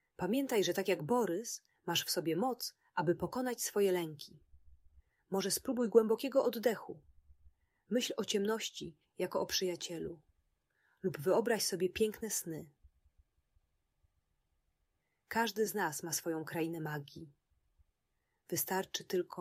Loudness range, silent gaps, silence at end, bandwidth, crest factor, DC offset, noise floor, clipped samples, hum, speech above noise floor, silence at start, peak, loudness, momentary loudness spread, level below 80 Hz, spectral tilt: 6 LU; none; 0 s; 16 kHz; 24 dB; under 0.1%; -83 dBFS; under 0.1%; none; 48 dB; 0.2 s; -14 dBFS; -35 LUFS; 12 LU; -70 dBFS; -3.5 dB/octave